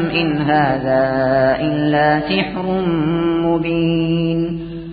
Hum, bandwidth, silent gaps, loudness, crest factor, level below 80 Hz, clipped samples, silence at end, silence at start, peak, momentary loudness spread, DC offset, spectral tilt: none; 5 kHz; none; -17 LUFS; 14 dB; -42 dBFS; under 0.1%; 0 s; 0 s; -2 dBFS; 4 LU; under 0.1%; -12 dB/octave